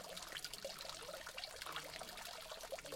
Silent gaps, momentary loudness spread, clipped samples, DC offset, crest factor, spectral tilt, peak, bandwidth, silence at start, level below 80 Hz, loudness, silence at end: none; 3 LU; under 0.1%; under 0.1%; 24 dB; -1 dB/octave; -26 dBFS; 17 kHz; 0 s; -68 dBFS; -48 LUFS; 0 s